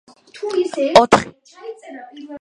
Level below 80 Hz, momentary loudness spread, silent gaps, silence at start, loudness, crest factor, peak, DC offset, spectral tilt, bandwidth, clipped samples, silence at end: -52 dBFS; 24 LU; none; 0.35 s; -15 LUFS; 18 dB; 0 dBFS; under 0.1%; -4 dB/octave; 11.5 kHz; under 0.1%; 0.05 s